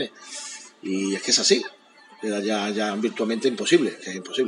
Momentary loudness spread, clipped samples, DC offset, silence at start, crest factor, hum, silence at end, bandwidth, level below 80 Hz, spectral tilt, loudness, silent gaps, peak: 15 LU; under 0.1%; under 0.1%; 0 s; 20 dB; none; 0 s; 11.5 kHz; -84 dBFS; -2.5 dB/octave; -23 LUFS; none; -4 dBFS